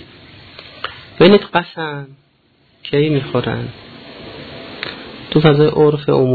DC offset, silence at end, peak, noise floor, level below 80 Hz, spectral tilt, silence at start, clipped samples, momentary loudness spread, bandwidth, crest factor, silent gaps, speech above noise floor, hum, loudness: under 0.1%; 0 s; 0 dBFS; -56 dBFS; -48 dBFS; -9.5 dB/octave; 0.65 s; under 0.1%; 23 LU; 4.8 kHz; 16 dB; none; 42 dB; none; -15 LUFS